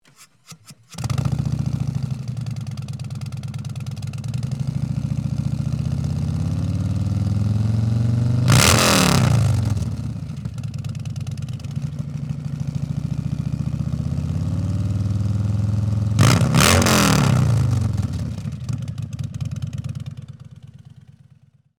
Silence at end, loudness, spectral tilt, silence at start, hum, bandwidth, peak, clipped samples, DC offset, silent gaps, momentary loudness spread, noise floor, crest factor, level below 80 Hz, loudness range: 1.05 s; -21 LUFS; -5 dB/octave; 0.2 s; none; over 20 kHz; 0 dBFS; under 0.1%; under 0.1%; none; 15 LU; -54 dBFS; 20 dB; -40 dBFS; 10 LU